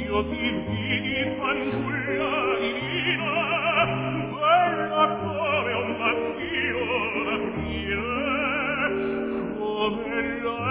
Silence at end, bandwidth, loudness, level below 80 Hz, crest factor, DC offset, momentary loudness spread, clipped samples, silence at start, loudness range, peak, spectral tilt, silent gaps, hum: 0 s; 4 kHz; -25 LUFS; -46 dBFS; 18 dB; under 0.1%; 6 LU; under 0.1%; 0 s; 3 LU; -8 dBFS; -9 dB/octave; none; none